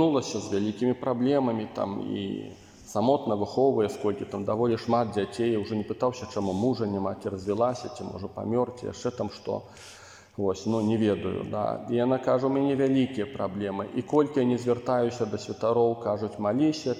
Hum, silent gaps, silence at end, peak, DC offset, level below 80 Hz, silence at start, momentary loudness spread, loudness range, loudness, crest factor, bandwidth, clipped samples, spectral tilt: none; none; 0 s; -10 dBFS; under 0.1%; -66 dBFS; 0 s; 10 LU; 4 LU; -28 LUFS; 18 dB; 12 kHz; under 0.1%; -6.5 dB/octave